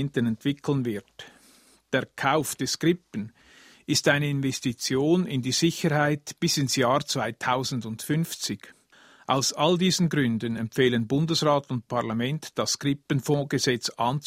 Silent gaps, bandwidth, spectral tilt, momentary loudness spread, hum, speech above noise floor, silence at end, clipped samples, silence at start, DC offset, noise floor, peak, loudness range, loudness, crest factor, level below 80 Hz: none; 16 kHz; -4.5 dB/octave; 8 LU; none; 32 dB; 0 s; under 0.1%; 0 s; under 0.1%; -58 dBFS; -6 dBFS; 3 LU; -25 LUFS; 20 dB; -62 dBFS